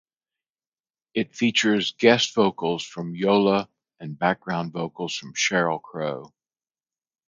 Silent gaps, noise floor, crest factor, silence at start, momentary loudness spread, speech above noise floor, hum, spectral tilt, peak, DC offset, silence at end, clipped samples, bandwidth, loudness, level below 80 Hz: none; under -90 dBFS; 22 dB; 1.15 s; 12 LU; over 67 dB; none; -4 dB/octave; -4 dBFS; under 0.1%; 1 s; under 0.1%; 9.2 kHz; -23 LUFS; -66 dBFS